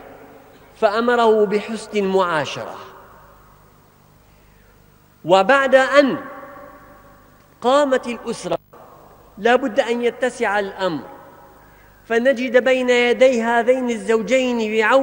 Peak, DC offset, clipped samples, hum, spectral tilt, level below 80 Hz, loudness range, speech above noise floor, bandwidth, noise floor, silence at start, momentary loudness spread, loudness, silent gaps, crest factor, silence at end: 0 dBFS; under 0.1%; under 0.1%; 50 Hz at -55 dBFS; -4.5 dB/octave; -56 dBFS; 6 LU; 34 dB; 16 kHz; -51 dBFS; 0.05 s; 14 LU; -18 LUFS; none; 20 dB; 0 s